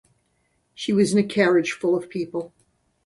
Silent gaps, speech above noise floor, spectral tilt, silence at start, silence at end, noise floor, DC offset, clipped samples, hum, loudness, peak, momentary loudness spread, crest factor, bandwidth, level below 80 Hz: none; 48 dB; -5.5 dB/octave; 0.8 s; 0.6 s; -69 dBFS; under 0.1%; under 0.1%; none; -22 LUFS; -4 dBFS; 13 LU; 18 dB; 11.5 kHz; -66 dBFS